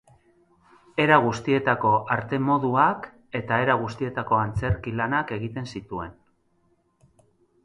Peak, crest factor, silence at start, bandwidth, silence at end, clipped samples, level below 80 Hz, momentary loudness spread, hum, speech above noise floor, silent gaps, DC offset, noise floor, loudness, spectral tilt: -4 dBFS; 22 dB; 0.95 s; 11 kHz; 1.5 s; under 0.1%; -48 dBFS; 14 LU; none; 43 dB; none; under 0.1%; -66 dBFS; -24 LUFS; -7 dB/octave